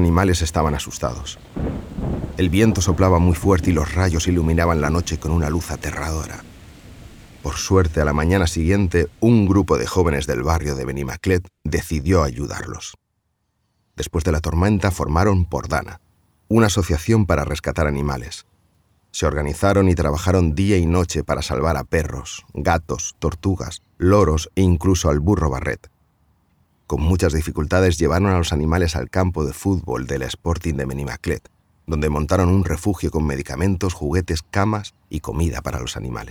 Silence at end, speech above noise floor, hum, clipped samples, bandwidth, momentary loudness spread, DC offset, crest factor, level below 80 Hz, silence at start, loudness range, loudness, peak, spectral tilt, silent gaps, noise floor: 0 s; 52 dB; none; under 0.1%; 16.5 kHz; 11 LU; under 0.1%; 16 dB; -30 dBFS; 0 s; 5 LU; -20 LUFS; -4 dBFS; -6 dB/octave; none; -71 dBFS